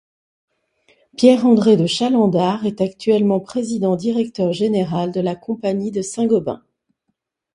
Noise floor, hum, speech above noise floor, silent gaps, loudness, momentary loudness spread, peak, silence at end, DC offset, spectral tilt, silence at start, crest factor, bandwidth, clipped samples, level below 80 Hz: -74 dBFS; none; 57 dB; none; -18 LUFS; 10 LU; 0 dBFS; 1 s; under 0.1%; -6.5 dB/octave; 1.2 s; 18 dB; 11.5 kHz; under 0.1%; -60 dBFS